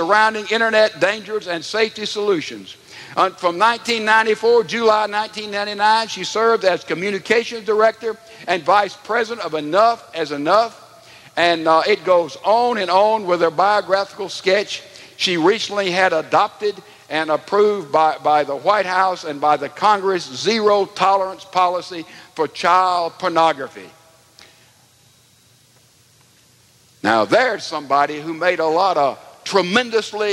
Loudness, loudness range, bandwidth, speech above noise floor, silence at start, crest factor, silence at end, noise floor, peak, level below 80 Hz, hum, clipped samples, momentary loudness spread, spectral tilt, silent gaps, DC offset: -18 LUFS; 4 LU; 13.5 kHz; 36 dB; 0 s; 18 dB; 0 s; -53 dBFS; 0 dBFS; -70 dBFS; none; under 0.1%; 10 LU; -3.5 dB/octave; none; under 0.1%